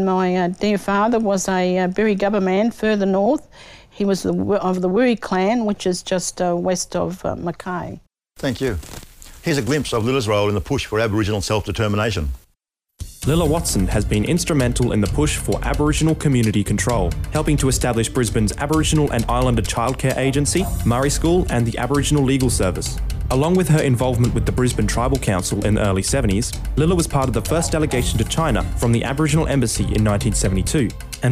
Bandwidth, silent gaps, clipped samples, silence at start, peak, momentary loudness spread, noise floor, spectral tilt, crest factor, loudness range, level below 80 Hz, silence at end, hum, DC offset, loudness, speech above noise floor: 16 kHz; none; under 0.1%; 0 s; -6 dBFS; 6 LU; -68 dBFS; -5.5 dB/octave; 14 dB; 3 LU; -30 dBFS; 0 s; none; under 0.1%; -19 LUFS; 50 dB